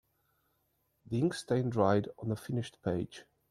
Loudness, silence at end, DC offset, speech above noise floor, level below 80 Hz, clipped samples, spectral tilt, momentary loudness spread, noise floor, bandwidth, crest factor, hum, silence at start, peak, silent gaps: -33 LUFS; 0.3 s; under 0.1%; 45 dB; -66 dBFS; under 0.1%; -7 dB/octave; 9 LU; -77 dBFS; 13.5 kHz; 20 dB; none; 1.1 s; -14 dBFS; none